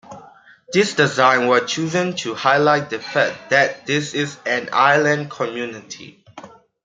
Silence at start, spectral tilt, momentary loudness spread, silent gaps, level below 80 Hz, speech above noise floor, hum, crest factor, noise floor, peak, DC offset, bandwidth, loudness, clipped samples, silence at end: 0.1 s; -4 dB/octave; 11 LU; none; -66 dBFS; 28 dB; none; 18 dB; -46 dBFS; -2 dBFS; under 0.1%; 9.6 kHz; -18 LUFS; under 0.1%; 0.35 s